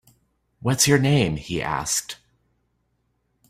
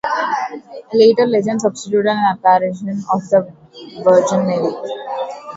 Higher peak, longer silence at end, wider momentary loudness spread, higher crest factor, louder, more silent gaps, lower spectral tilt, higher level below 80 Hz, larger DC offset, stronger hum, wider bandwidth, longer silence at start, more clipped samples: second, -4 dBFS vs 0 dBFS; first, 1.35 s vs 0 s; about the same, 14 LU vs 13 LU; about the same, 20 dB vs 16 dB; second, -21 LUFS vs -16 LUFS; neither; second, -4 dB/octave vs -5.5 dB/octave; first, -50 dBFS vs -62 dBFS; neither; neither; first, 16 kHz vs 8 kHz; first, 0.65 s vs 0.05 s; neither